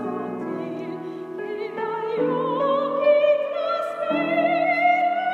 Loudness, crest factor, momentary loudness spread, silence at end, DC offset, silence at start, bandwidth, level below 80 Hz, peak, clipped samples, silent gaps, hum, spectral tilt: -23 LUFS; 14 dB; 13 LU; 0 s; under 0.1%; 0 s; 7 kHz; -82 dBFS; -8 dBFS; under 0.1%; none; none; -6.5 dB/octave